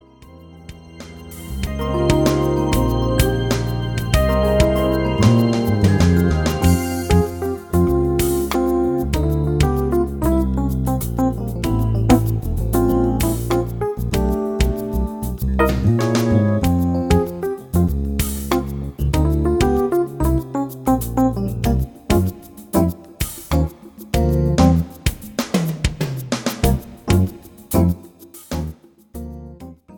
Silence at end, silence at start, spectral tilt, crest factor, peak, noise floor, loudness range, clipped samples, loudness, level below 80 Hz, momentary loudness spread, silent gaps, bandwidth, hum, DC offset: 0 s; 0.2 s; -6.5 dB/octave; 16 dB; -2 dBFS; -43 dBFS; 4 LU; under 0.1%; -19 LUFS; -26 dBFS; 10 LU; none; 19.5 kHz; none; under 0.1%